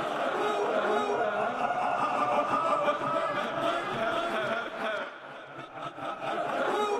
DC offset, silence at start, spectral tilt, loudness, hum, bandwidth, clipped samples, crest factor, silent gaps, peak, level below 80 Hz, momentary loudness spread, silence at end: under 0.1%; 0 s; -4.5 dB/octave; -29 LUFS; none; 14 kHz; under 0.1%; 16 dB; none; -14 dBFS; -68 dBFS; 11 LU; 0 s